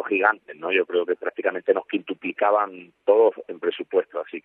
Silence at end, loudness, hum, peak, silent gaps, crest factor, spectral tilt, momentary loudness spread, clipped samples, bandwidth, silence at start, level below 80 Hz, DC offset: 0.05 s; -23 LUFS; none; -4 dBFS; none; 20 dB; -7.5 dB/octave; 10 LU; under 0.1%; 3.9 kHz; 0 s; -84 dBFS; under 0.1%